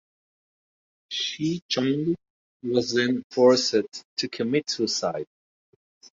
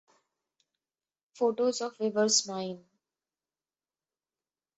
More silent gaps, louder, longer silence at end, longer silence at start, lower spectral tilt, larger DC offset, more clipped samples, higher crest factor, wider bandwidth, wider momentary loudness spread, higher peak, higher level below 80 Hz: first, 1.62-1.69 s, 2.30-2.60 s, 3.24-3.30 s, 4.05-4.17 s vs none; first, -25 LUFS vs -29 LUFS; second, 0.9 s vs 2 s; second, 1.1 s vs 1.35 s; first, -4 dB/octave vs -2.5 dB/octave; neither; neither; about the same, 20 dB vs 24 dB; second, 7.8 kHz vs 8.6 kHz; about the same, 13 LU vs 13 LU; first, -6 dBFS vs -10 dBFS; first, -68 dBFS vs -82 dBFS